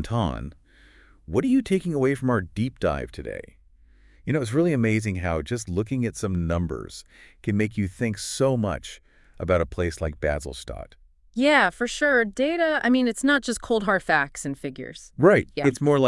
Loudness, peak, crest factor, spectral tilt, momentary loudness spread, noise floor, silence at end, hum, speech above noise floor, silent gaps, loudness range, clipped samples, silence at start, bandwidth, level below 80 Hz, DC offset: -24 LUFS; -4 dBFS; 20 dB; -5.5 dB/octave; 15 LU; -54 dBFS; 0 s; none; 31 dB; none; 5 LU; under 0.1%; 0 s; 12 kHz; -46 dBFS; under 0.1%